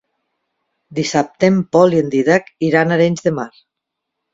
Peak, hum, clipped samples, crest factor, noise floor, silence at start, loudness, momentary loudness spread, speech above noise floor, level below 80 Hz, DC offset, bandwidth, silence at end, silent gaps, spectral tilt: 0 dBFS; none; under 0.1%; 16 dB; -79 dBFS; 0.9 s; -15 LUFS; 10 LU; 64 dB; -58 dBFS; under 0.1%; 7.8 kHz; 0.85 s; none; -6 dB/octave